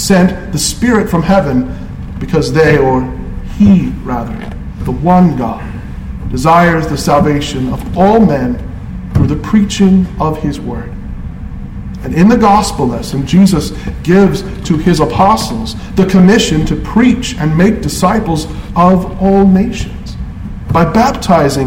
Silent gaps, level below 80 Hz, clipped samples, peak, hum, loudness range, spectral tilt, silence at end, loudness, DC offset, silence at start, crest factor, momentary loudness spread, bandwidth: none; -24 dBFS; under 0.1%; 0 dBFS; none; 3 LU; -6 dB/octave; 0 s; -11 LUFS; under 0.1%; 0 s; 10 dB; 16 LU; 16 kHz